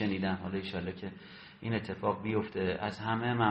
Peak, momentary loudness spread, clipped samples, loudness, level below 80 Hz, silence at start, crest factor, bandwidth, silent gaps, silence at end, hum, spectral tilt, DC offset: -14 dBFS; 12 LU; under 0.1%; -35 LUFS; -64 dBFS; 0 s; 20 dB; 8.2 kHz; none; 0 s; none; -8 dB/octave; under 0.1%